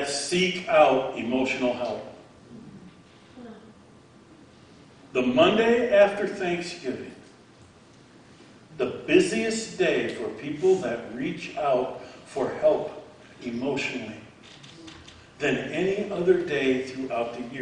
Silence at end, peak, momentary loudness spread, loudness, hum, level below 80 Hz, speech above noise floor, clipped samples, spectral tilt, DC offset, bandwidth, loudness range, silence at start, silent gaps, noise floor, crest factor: 0 s; -6 dBFS; 24 LU; -25 LUFS; none; -62 dBFS; 28 dB; under 0.1%; -4.5 dB/octave; under 0.1%; 10.5 kHz; 7 LU; 0 s; none; -52 dBFS; 20 dB